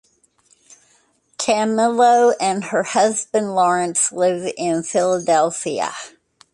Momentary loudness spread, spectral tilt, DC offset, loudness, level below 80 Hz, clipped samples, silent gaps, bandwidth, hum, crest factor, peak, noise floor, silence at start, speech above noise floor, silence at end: 9 LU; -3.5 dB/octave; under 0.1%; -18 LUFS; -68 dBFS; under 0.1%; none; 11.5 kHz; none; 16 dB; -4 dBFS; -59 dBFS; 1.4 s; 42 dB; 0.45 s